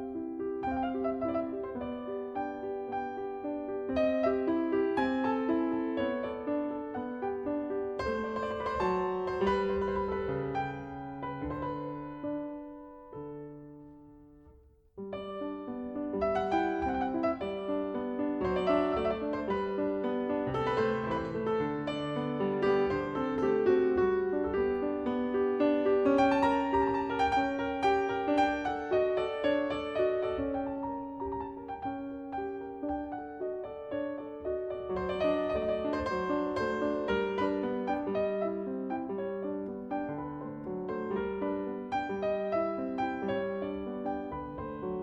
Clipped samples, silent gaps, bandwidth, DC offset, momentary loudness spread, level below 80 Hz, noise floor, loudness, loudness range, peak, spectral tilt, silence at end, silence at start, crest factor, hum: under 0.1%; none; 8.4 kHz; under 0.1%; 10 LU; -56 dBFS; -59 dBFS; -32 LUFS; 9 LU; -14 dBFS; -7 dB/octave; 0 s; 0 s; 18 dB; none